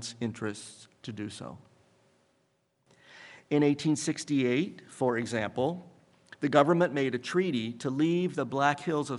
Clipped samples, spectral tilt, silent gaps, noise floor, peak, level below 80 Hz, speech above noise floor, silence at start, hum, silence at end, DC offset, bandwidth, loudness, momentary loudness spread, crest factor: under 0.1%; -5.5 dB/octave; none; -73 dBFS; -6 dBFS; -76 dBFS; 44 dB; 0 s; none; 0 s; under 0.1%; 11.5 kHz; -29 LUFS; 18 LU; 24 dB